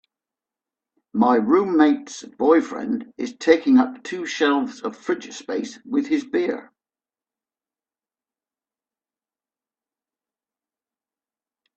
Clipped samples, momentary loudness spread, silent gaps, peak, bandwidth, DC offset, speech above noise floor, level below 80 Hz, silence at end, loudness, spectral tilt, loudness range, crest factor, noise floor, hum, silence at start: under 0.1%; 13 LU; none; -2 dBFS; 8.4 kHz; under 0.1%; over 70 dB; -68 dBFS; 5.15 s; -21 LUFS; -5 dB/octave; 10 LU; 22 dB; under -90 dBFS; none; 1.15 s